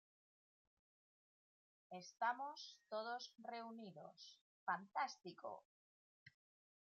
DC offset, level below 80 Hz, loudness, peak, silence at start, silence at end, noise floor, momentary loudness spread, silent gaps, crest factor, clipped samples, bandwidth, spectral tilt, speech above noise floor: under 0.1%; under -90 dBFS; -49 LUFS; -30 dBFS; 1.9 s; 0.6 s; under -90 dBFS; 15 LU; 4.41-4.67 s, 5.65-6.26 s; 22 dB; under 0.1%; 7.4 kHz; -1.5 dB/octave; over 41 dB